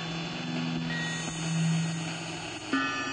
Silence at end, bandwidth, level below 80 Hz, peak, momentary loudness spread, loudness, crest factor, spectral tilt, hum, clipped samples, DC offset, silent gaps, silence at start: 0 s; 9.6 kHz; -60 dBFS; -16 dBFS; 6 LU; -31 LUFS; 16 dB; -4.5 dB/octave; none; under 0.1%; under 0.1%; none; 0 s